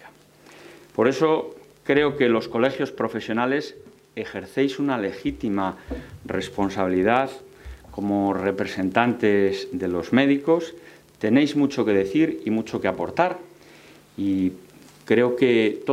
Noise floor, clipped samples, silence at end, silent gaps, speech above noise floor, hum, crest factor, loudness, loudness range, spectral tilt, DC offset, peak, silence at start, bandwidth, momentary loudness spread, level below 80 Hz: -50 dBFS; under 0.1%; 0 s; none; 28 dB; none; 22 dB; -23 LUFS; 4 LU; -6.5 dB/octave; under 0.1%; -2 dBFS; 0.05 s; 14 kHz; 15 LU; -52 dBFS